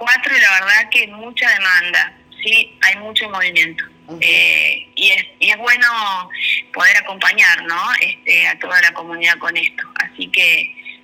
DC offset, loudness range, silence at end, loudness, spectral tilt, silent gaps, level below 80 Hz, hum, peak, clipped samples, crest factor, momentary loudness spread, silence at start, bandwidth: under 0.1%; 1 LU; 0.1 s; -13 LUFS; 0 dB/octave; none; -64 dBFS; none; 0 dBFS; under 0.1%; 14 dB; 9 LU; 0 s; over 20 kHz